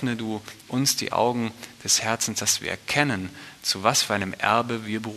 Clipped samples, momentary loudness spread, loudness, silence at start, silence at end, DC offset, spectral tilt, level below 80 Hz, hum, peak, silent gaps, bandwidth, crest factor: under 0.1%; 10 LU; -24 LUFS; 0 s; 0 s; under 0.1%; -2.5 dB/octave; -62 dBFS; none; -2 dBFS; none; 13.5 kHz; 24 dB